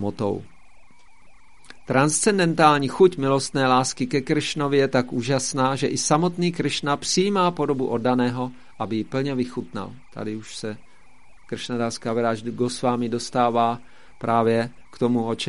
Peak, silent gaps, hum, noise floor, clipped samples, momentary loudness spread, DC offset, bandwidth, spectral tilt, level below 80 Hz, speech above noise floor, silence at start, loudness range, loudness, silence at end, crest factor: -2 dBFS; none; none; -54 dBFS; under 0.1%; 14 LU; 0.7%; 11.5 kHz; -4.5 dB/octave; -56 dBFS; 32 dB; 0 s; 9 LU; -22 LUFS; 0 s; 20 dB